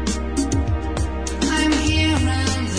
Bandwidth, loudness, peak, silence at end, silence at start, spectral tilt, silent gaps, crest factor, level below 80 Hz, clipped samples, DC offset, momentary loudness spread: 10.5 kHz; -20 LUFS; -6 dBFS; 0 s; 0 s; -4.5 dB/octave; none; 14 dB; -26 dBFS; under 0.1%; 1%; 6 LU